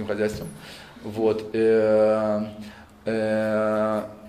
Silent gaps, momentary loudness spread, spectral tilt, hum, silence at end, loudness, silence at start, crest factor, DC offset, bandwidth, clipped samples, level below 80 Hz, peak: none; 20 LU; -6.5 dB/octave; none; 0 s; -23 LUFS; 0 s; 14 dB; under 0.1%; 14.5 kHz; under 0.1%; -56 dBFS; -10 dBFS